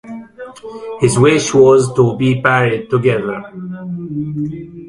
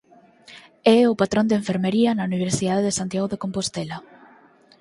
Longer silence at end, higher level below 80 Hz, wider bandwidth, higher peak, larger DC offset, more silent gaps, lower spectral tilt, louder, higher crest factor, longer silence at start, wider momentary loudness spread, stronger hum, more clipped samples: second, 0 s vs 0.8 s; first, -48 dBFS vs -56 dBFS; about the same, 11.5 kHz vs 11.5 kHz; first, 0 dBFS vs -4 dBFS; neither; neither; about the same, -6 dB/octave vs -5 dB/octave; first, -14 LUFS vs -21 LUFS; second, 14 dB vs 20 dB; second, 0.05 s vs 0.5 s; first, 20 LU vs 10 LU; neither; neither